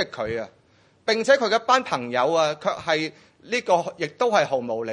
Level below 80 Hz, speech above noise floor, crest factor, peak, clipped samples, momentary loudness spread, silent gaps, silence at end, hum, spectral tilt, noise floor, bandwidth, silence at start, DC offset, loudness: -64 dBFS; 33 dB; 20 dB; -4 dBFS; under 0.1%; 11 LU; none; 0 s; none; -3.5 dB/octave; -56 dBFS; 10.5 kHz; 0 s; under 0.1%; -23 LUFS